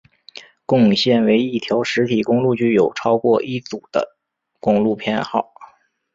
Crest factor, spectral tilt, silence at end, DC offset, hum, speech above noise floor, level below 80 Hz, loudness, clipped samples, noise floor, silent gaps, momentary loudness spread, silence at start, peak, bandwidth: 16 dB; -6 dB/octave; 0.5 s; under 0.1%; none; 52 dB; -58 dBFS; -18 LUFS; under 0.1%; -69 dBFS; none; 11 LU; 0.35 s; -2 dBFS; 7.6 kHz